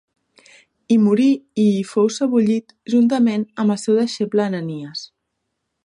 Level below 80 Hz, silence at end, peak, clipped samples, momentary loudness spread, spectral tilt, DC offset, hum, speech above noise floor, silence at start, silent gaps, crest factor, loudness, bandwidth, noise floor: -68 dBFS; 0.8 s; -6 dBFS; under 0.1%; 10 LU; -6.5 dB/octave; under 0.1%; none; 58 dB; 0.9 s; none; 14 dB; -18 LUFS; 11 kHz; -75 dBFS